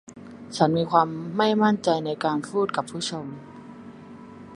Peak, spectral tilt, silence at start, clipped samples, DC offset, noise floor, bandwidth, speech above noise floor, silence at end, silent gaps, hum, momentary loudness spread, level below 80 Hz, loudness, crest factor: -2 dBFS; -5.5 dB/octave; 0.1 s; under 0.1%; under 0.1%; -43 dBFS; 11.5 kHz; 20 dB; 0 s; none; none; 23 LU; -64 dBFS; -24 LUFS; 22 dB